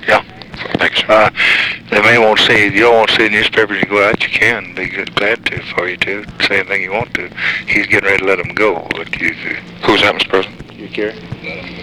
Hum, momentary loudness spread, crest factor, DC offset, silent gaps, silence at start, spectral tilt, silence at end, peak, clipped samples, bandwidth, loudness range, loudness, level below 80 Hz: none; 13 LU; 14 dB; 0.2%; none; 0 s; -4 dB/octave; 0 s; 0 dBFS; under 0.1%; 17.5 kHz; 6 LU; -12 LUFS; -44 dBFS